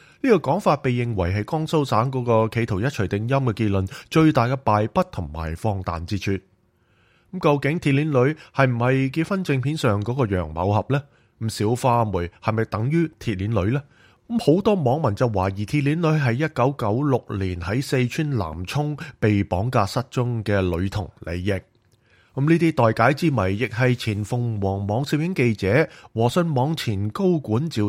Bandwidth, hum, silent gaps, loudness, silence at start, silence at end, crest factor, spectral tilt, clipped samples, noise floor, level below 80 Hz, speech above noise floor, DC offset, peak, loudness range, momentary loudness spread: 15.5 kHz; none; none; -22 LUFS; 0.25 s; 0 s; 20 dB; -7 dB/octave; under 0.1%; -62 dBFS; -46 dBFS; 40 dB; under 0.1%; -2 dBFS; 3 LU; 8 LU